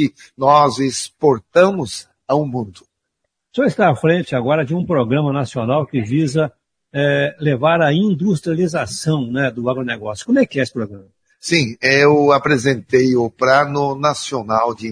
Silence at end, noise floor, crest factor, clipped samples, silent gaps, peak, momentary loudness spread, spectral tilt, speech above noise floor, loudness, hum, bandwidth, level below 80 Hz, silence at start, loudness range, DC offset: 0 s; -75 dBFS; 16 dB; under 0.1%; none; 0 dBFS; 10 LU; -5.5 dB/octave; 59 dB; -17 LUFS; none; 10.5 kHz; -56 dBFS; 0 s; 4 LU; under 0.1%